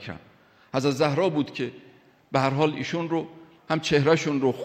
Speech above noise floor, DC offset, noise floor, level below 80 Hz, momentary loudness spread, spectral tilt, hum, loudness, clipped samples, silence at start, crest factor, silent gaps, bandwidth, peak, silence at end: 32 dB; under 0.1%; -56 dBFS; -62 dBFS; 12 LU; -6 dB/octave; none; -25 LUFS; under 0.1%; 0 s; 18 dB; none; 14.5 kHz; -6 dBFS; 0 s